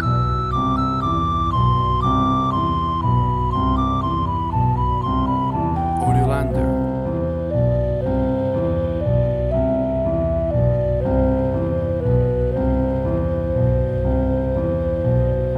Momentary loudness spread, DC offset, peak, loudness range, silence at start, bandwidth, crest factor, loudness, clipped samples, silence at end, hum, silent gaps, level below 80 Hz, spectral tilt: 3 LU; under 0.1%; -6 dBFS; 1 LU; 0 s; 9.8 kHz; 14 dB; -20 LUFS; under 0.1%; 0 s; none; none; -28 dBFS; -9.5 dB/octave